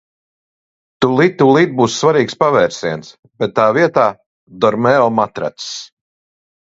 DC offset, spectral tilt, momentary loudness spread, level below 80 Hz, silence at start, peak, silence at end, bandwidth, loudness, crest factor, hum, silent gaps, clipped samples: under 0.1%; -5.5 dB/octave; 12 LU; -56 dBFS; 1 s; 0 dBFS; 0.8 s; 8 kHz; -14 LUFS; 16 dB; none; 3.19-3.23 s, 4.26-4.47 s; under 0.1%